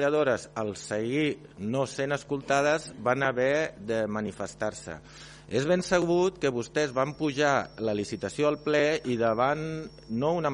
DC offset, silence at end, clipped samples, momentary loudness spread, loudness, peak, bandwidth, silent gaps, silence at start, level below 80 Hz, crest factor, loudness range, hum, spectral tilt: under 0.1%; 0 s; under 0.1%; 9 LU; -28 LUFS; -10 dBFS; 10.5 kHz; none; 0 s; -58 dBFS; 18 dB; 2 LU; none; -5 dB/octave